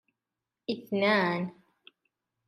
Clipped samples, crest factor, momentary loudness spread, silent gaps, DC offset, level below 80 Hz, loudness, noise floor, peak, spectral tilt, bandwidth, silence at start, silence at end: under 0.1%; 20 dB; 14 LU; none; under 0.1%; -78 dBFS; -29 LUFS; -89 dBFS; -12 dBFS; -7 dB/octave; 13.5 kHz; 0.7 s; 0.95 s